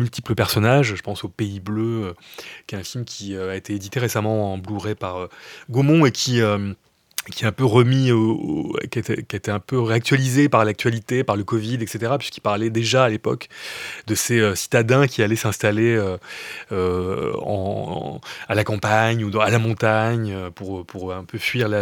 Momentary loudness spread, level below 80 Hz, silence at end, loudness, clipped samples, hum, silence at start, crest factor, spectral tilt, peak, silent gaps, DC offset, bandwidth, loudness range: 14 LU; -56 dBFS; 0 s; -21 LUFS; under 0.1%; none; 0 s; 20 dB; -5.5 dB/octave; -2 dBFS; none; under 0.1%; 18.5 kHz; 6 LU